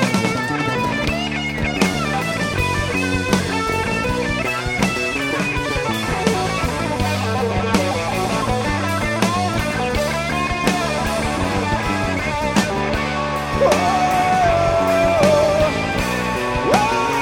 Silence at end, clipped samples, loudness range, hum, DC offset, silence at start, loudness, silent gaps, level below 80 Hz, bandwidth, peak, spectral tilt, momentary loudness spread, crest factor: 0 s; under 0.1%; 3 LU; none; under 0.1%; 0 s; -19 LUFS; none; -34 dBFS; 17 kHz; 0 dBFS; -5 dB/octave; 5 LU; 18 dB